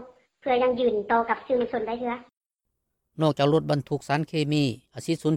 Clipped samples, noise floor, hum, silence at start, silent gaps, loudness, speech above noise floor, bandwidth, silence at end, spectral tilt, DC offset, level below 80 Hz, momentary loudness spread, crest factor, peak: under 0.1%; -81 dBFS; none; 0 s; 2.37-2.41 s; -25 LUFS; 56 dB; 13 kHz; 0 s; -6.5 dB/octave; under 0.1%; -60 dBFS; 9 LU; 16 dB; -10 dBFS